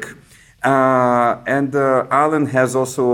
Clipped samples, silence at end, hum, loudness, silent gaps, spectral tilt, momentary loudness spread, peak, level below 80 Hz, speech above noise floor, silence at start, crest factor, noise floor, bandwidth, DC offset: under 0.1%; 0 s; none; -16 LUFS; none; -6 dB/octave; 5 LU; -2 dBFS; -56 dBFS; 31 dB; 0 s; 16 dB; -46 dBFS; 17.5 kHz; under 0.1%